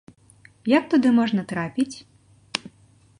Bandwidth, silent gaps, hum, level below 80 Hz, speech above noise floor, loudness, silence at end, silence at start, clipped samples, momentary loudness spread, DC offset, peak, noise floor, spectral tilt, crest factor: 11 kHz; none; none; -64 dBFS; 35 dB; -23 LUFS; 0.6 s; 0.65 s; under 0.1%; 13 LU; under 0.1%; -2 dBFS; -56 dBFS; -5.5 dB/octave; 22 dB